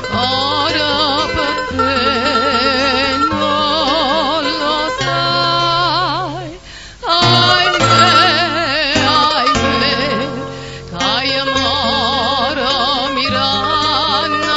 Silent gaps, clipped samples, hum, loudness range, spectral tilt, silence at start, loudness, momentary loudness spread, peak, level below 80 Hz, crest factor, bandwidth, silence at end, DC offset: none; under 0.1%; none; 4 LU; -3.5 dB/octave; 0 s; -13 LUFS; 8 LU; 0 dBFS; -38 dBFS; 14 dB; 11 kHz; 0 s; 0.3%